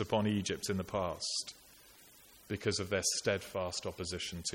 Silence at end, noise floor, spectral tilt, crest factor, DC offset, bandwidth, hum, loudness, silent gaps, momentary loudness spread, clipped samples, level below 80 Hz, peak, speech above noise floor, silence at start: 0 s; -60 dBFS; -3.5 dB/octave; 20 dB; under 0.1%; 17 kHz; none; -36 LUFS; none; 7 LU; under 0.1%; -62 dBFS; -18 dBFS; 24 dB; 0 s